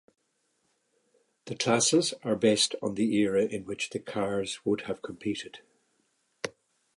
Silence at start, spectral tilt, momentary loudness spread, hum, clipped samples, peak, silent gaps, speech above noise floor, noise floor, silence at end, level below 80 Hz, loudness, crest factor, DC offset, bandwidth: 1.45 s; -3.5 dB/octave; 16 LU; none; under 0.1%; -12 dBFS; none; 46 dB; -75 dBFS; 0.45 s; -68 dBFS; -28 LUFS; 20 dB; under 0.1%; 11.5 kHz